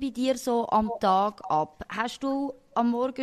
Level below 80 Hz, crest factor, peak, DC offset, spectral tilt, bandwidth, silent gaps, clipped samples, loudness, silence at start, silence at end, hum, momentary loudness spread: -56 dBFS; 16 dB; -12 dBFS; under 0.1%; -5 dB/octave; 15 kHz; none; under 0.1%; -27 LUFS; 0 s; 0 s; none; 7 LU